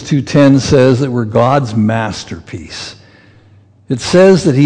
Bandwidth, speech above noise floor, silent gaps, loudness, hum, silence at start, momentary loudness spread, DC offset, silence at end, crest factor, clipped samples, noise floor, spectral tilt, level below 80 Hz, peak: 10 kHz; 34 dB; none; -11 LUFS; none; 0 s; 18 LU; under 0.1%; 0 s; 12 dB; under 0.1%; -45 dBFS; -6.5 dB/octave; -42 dBFS; 0 dBFS